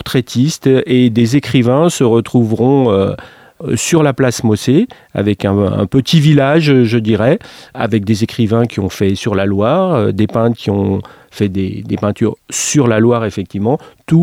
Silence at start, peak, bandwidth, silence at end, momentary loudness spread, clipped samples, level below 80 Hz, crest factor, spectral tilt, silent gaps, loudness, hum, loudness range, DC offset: 0 s; 0 dBFS; 16 kHz; 0 s; 8 LU; under 0.1%; -46 dBFS; 12 dB; -6 dB/octave; none; -13 LUFS; none; 3 LU; under 0.1%